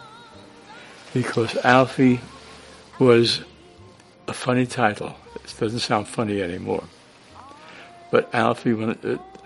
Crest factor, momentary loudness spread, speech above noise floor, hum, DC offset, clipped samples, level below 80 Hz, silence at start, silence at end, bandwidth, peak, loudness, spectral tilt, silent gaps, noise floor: 24 dB; 26 LU; 27 dB; none; under 0.1%; under 0.1%; -58 dBFS; 0 s; 0.15 s; 11.5 kHz; 0 dBFS; -22 LUFS; -5.5 dB/octave; none; -48 dBFS